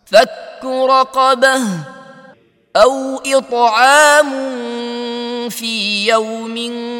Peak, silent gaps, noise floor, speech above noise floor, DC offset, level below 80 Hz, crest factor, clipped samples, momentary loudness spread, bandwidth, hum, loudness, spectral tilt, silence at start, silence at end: 0 dBFS; none; -46 dBFS; 33 dB; under 0.1%; -56 dBFS; 14 dB; 0.1%; 14 LU; 17.5 kHz; none; -14 LUFS; -2.5 dB/octave; 0.1 s; 0 s